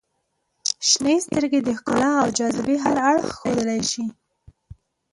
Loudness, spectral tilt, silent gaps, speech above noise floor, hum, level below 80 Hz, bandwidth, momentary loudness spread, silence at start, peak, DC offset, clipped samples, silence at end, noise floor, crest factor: -21 LUFS; -3 dB/octave; none; 53 dB; none; -56 dBFS; 11.5 kHz; 7 LU; 0.65 s; -4 dBFS; under 0.1%; under 0.1%; 0.4 s; -73 dBFS; 18 dB